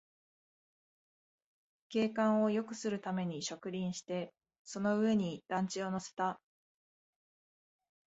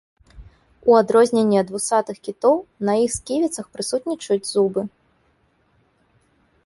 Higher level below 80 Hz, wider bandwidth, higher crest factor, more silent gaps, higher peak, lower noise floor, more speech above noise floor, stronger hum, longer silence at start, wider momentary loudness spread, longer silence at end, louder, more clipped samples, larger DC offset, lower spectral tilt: second, -78 dBFS vs -54 dBFS; second, 8 kHz vs 11.5 kHz; about the same, 18 dB vs 20 dB; first, 4.59-4.65 s vs none; second, -20 dBFS vs -2 dBFS; first, under -90 dBFS vs -63 dBFS; first, over 55 dB vs 43 dB; neither; first, 1.9 s vs 0.35 s; about the same, 10 LU vs 9 LU; about the same, 1.75 s vs 1.8 s; second, -36 LUFS vs -20 LUFS; neither; neither; about the same, -5.5 dB/octave vs -4.5 dB/octave